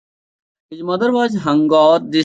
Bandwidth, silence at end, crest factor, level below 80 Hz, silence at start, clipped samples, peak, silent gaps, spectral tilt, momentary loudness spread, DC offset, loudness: 8 kHz; 0 s; 14 dB; -60 dBFS; 0.7 s; under 0.1%; -2 dBFS; none; -6 dB/octave; 10 LU; under 0.1%; -15 LUFS